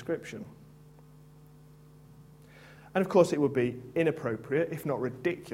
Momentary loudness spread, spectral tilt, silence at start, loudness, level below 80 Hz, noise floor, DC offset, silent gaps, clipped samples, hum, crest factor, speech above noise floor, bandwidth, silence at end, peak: 12 LU; -7 dB/octave; 0 s; -29 LUFS; -66 dBFS; -54 dBFS; under 0.1%; none; under 0.1%; none; 22 dB; 25 dB; 16.5 kHz; 0 s; -8 dBFS